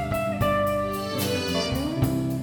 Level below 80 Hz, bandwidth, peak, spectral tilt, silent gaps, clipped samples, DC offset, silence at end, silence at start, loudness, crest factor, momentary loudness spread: -42 dBFS; 19.5 kHz; -10 dBFS; -5.5 dB/octave; none; under 0.1%; under 0.1%; 0 s; 0 s; -25 LUFS; 16 dB; 4 LU